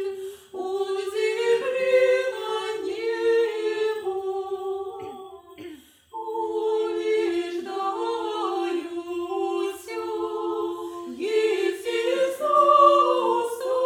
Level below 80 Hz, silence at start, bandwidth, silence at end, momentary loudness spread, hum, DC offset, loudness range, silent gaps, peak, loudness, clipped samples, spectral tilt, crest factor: -72 dBFS; 0 s; 16 kHz; 0 s; 15 LU; none; under 0.1%; 7 LU; none; -4 dBFS; -24 LUFS; under 0.1%; -3 dB/octave; 20 dB